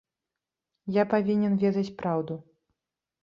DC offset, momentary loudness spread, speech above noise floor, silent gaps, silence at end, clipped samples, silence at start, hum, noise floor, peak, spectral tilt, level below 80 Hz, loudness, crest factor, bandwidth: under 0.1%; 13 LU; 62 dB; none; 0.8 s; under 0.1%; 0.85 s; none; -88 dBFS; -10 dBFS; -9 dB/octave; -68 dBFS; -27 LUFS; 18 dB; 6.8 kHz